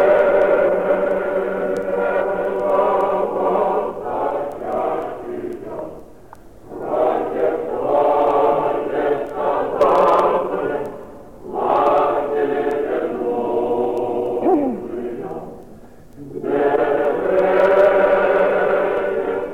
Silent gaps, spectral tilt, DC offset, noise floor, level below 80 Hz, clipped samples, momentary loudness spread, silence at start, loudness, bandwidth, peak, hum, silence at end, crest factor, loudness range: none; -7 dB/octave; 0.6%; -43 dBFS; -50 dBFS; under 0.1%; 14 LU; 0 s; -18 LUFS; 9.8 kHz; -4 dBFS; none; 0 s; 16 dB; 6 LU